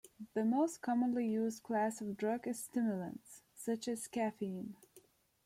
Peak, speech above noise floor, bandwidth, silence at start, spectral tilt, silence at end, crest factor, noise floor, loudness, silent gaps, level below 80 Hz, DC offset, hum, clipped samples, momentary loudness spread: -24 dBFS; 30 dB; 15.5 kHz; 0.05 s; -5.5 dB/octave; 0.45 s; 14 dB; -67 dBFS; -38 LUFS; none; -80 dBFS; under 0.1%; none; under 0.1%; 12 LU